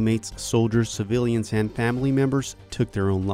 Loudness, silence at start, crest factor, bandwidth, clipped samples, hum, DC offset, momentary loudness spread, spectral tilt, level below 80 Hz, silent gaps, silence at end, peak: -24 LUFS; 0 s; 16 dB; 15 kHz; under 0.1%; none; under 0.1%; 6 LU; -6 dB/octave; -46 dBFS; none; 0 s; -8 dBFS